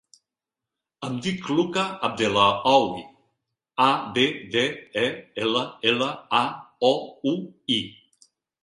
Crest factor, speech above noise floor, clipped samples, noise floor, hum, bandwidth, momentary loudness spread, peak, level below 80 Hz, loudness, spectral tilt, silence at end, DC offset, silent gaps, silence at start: 20 dB; 64 dB; under 0.1%; -88 dBFS; none; 11 kHz; 10 LU; -4 dBFS; -64 dBFS; -24 LUFS; -4.5 dB/octave; 0.7 s; under 0.1%; none; 1 s